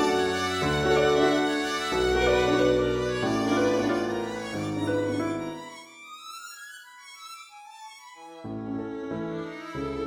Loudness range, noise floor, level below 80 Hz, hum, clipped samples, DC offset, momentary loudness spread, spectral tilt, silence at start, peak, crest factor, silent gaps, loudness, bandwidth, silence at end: 15 LU; -46 dBFS; -46 dBFS; none; under 0.1%; under 0.1%; 21 LU; -5 dB/octave; 0 s; -10 dBFS; 16 dB; none; -26 LUFS; 18 kHz; 0 s